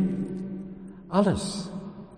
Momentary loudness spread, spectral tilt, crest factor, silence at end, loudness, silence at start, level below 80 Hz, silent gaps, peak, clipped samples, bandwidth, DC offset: 16 LU; -6.5 dB/octave; 20 dB; 0 s; -29 LUFS; 0 s; -52 dBFS; none; -10 dBFS; under 0.1%; 10 kHz; under 0.1%